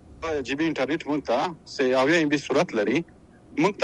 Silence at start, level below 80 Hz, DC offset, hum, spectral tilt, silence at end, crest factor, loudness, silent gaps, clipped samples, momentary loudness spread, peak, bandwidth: 0.1 s; -56 dBFS; under 0.1%; none; -5 dB/octave; 0 s; 18 dB; -25 LUFS; none; under 0.1%; 10 LU; -6 dBFS; 11 kHz